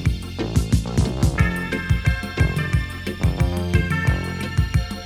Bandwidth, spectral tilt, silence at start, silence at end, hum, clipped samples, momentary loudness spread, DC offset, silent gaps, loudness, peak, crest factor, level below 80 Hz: 16 kHz; -6 dB/octave; 0 s; 0 s; none; under 0.1%; 5 LU; under 0.1%; none; -22 LUFS; -4 dBFS; 18 dB; -26 dBFS